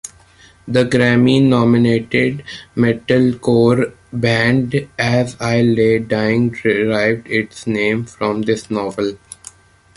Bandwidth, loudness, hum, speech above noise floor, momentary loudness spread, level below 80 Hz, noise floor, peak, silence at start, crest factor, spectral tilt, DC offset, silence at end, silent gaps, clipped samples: 11.5 kHz; -16 LUFS; none; 32 dB; 10 LU; -48 dBFS; -47 dBFS; -2 dBFS; 0.05 s; 14 dB; -6.5 dB/octave; under 0.1%; 0.8 s; none; under 0.1%